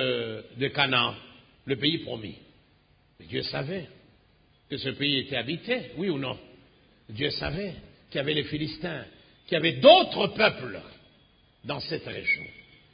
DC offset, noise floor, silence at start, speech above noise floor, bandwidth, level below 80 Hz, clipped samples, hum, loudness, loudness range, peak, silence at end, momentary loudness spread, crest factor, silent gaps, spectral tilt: under 0.1%; -63 dBFS; 0 s; 36 dB; 5.2 kHz; -56 dBFS; under 0.1%; none; -26 LUFS; 9 LU; -2 dBFS; 0.35 s; 17 LU; 26 dB; none; -9 dB/octave